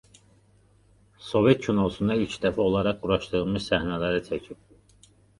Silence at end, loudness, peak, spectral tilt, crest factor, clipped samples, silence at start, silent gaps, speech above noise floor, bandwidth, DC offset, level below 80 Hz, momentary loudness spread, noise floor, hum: 0.85 s; -25 LUFS; -6 dBFS; -6.5 dB/octave; 22 dB; under 0.1%; 1.2 s; none; 35 dB; 11.5 kHz; under 0.1%; -48 dBFS; 10 LU; -60 dBFS; none